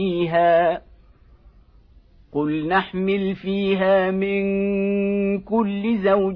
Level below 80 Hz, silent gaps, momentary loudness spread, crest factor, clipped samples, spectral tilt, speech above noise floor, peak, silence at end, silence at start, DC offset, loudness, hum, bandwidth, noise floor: -50 dBFS; none; 6 LU; 16 dB; under 0.1%; -10 dB/octave; 31 dB; -6 dBFS; 0 s; 0 s; under 0.1%; -21 LUFS; none; 5.2 kHz; -51 dBFS